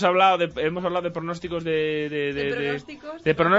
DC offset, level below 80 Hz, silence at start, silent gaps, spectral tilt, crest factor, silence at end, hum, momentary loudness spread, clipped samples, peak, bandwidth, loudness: under 0.1%; -54 dBFS; 0 s; none; -6 dB/octave; 18 dB; 0 s; none; 10 LU; under 0.1%; -6 dBFS; 8 kHz; -24 LUFS